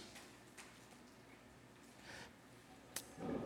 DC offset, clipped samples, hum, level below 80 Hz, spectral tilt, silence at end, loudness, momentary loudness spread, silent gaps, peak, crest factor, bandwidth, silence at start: under 0.1%; under 0.1%; none; -74 dBFS; -4 dB/octave; 0 s; -55 LUFS; 13 LU; none; -26 dBFS; 28 dB; 17 kHz; 0 s